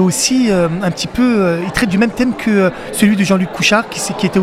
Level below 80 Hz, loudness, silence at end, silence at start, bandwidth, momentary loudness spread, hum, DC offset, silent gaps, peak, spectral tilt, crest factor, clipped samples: -40 dBFS; -14 LUFS; 0 s; 0 s; 15.5 kHz; 4 LU; none; under 0.1%; none; 0 dBFS; -4.5 dB/octave; 14 dB; under 0.1%